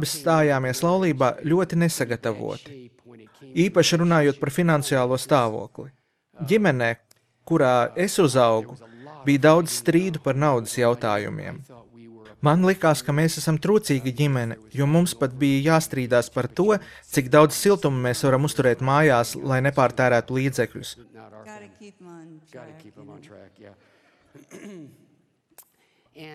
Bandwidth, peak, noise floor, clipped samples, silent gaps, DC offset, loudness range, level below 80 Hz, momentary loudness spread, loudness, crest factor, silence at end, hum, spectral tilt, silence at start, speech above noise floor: 16 kHz; -2 dBFS; -64 dBFS; under 0.1%; none; under 0.1%; 3 LU; -60 dBFS; 13 LU; -21 LUFS; 20 dB; 0 s; none; -5.5 dB/octave; 0 s; 43 dB